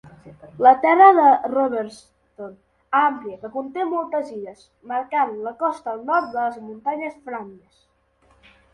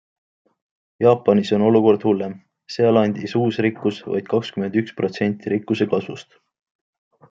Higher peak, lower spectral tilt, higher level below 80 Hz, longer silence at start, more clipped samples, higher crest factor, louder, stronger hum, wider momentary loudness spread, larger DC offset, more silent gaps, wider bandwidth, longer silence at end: about the same, 0 dBFS vs -2 dBFS; second, -6 dB/octave vs -7.5 dB/octave; about the same, -66 dBFS vs -66 dBFS; second, 0.25 s vs 1 s; neither; about the same, 20 dB vs 18 dB; about the same, -19 LUFS vs -20 LUFS; first, 50 Hz at -65 dBFS vs none; first, 22 LU vs 10 LU; neither; neither; first, 9.6 kHz vs 7.6 kHz; about the same, 1.2 s vs 1.1 s